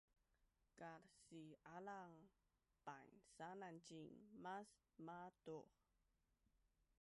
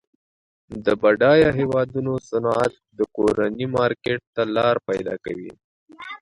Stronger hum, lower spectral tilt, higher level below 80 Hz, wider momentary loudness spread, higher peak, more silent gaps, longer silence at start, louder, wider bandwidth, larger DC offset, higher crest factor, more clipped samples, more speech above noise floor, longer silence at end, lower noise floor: neither; second, -5.5 dB/octave vs -7 dB/octave; second, -88 dBFS vs -52 dBFS; second, 8 LU vs 16 LU; second, -42 dBFS vs -4 dBFS; second, none vs 4.27-4.33 s, 5.64-5.86 s; second, 0.4 s vs 0.7 s; second, -60 LUFS vs -21 LUFS; about the same, 11.5 kHz vs 11 kHz; neither; about the same, 18 dB vs 18 dB; neither; second, 29 dB vs over 69 dB; first, 0.35 s vs 0.05 s; about the same, -88 dBFS vs under -90 dBFS